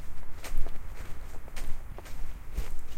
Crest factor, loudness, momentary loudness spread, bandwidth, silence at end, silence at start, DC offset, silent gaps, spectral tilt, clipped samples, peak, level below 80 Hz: 14 dB; -43 LUFS; 6 LU; 9.4 kHz; 0 s; 0 s; under 0.1%; none; -4.5 dB/octave; under 0.1%; -10 dBFS; -32 dBFS